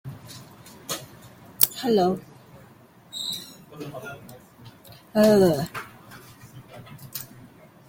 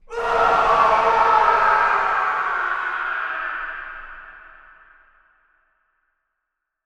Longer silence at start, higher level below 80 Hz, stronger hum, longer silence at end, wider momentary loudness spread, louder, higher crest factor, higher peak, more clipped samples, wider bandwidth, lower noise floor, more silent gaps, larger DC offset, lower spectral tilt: about the same, 0.05 s vs 0.1 s; second, -60 dBFS vs -48 dBFS; neither; second, 0.65 s vs 2.4 s; first, 27 LU vs 17 LU; second, -23 LUFS vs -18 LUFS; first, 28 dB vs 18 dB; first, 0 dBFS vs -4 dBFS; neither; first, 17 kHz vs 10.5 kHz; second, -52 dBFS vs -80 dBFS; neither; neither; first, -4.5 dB/octave vs -3 dB/octave